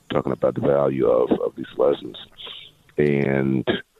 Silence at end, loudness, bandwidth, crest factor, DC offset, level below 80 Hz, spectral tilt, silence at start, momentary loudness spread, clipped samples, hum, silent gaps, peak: 0.2 s; -21 LUFS; 7.2 kHz; 18 dB; under 0.1%; -52 dBFS; -8.5 dB/octave; 0.1 s; 17 LU; under 0.1%; none; none; -4 dBFS